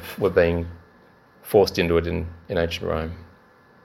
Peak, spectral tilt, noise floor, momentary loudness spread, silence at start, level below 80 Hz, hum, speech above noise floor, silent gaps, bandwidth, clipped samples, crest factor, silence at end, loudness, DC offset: -4 dBFS; -6 dB/octave; -54 dBFS; 16 LU; 0 s; -42 dBFS; none; 32 dB; none; 16.5 kHz; under 0.1%; 20 dB; 0.6 s; -23 LUFS; under 0.1%